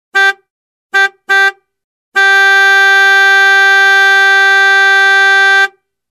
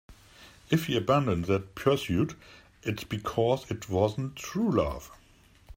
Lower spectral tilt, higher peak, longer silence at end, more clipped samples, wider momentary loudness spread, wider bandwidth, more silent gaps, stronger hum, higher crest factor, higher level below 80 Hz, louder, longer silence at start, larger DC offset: second, 2.5 dB/octave vs -6.5 dB/octave; first, 0 dBFS vs -10 dBFS; first, 0.4 s vs 0.05 s; neither; second, 6 LU vs 10 LU; second, 13.5 kHz vs 16 kHz; first, 0.50-0.90 s, 1.84-2.12 s vs none; neither; second, 8 dB vs 20 dB; second, -78 dBFS vs -52 dBFS; first, -7 LUFS vs -29 LUFS; about the same, 0.15 s vs 0.1 s; neither